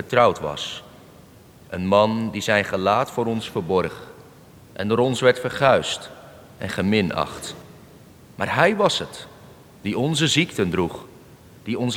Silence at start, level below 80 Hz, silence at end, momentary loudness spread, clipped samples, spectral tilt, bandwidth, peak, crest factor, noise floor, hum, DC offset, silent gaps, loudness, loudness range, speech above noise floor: 0 s; -56 dBFS; 0 s; 18 LU; under 0.1%; -4.5 dB/octave; over 20 kHz; -4 dBFS; 20 dB; -48 dBFS; none; under 0.1%; none; -21 LUFS; 2 LU; 27 dB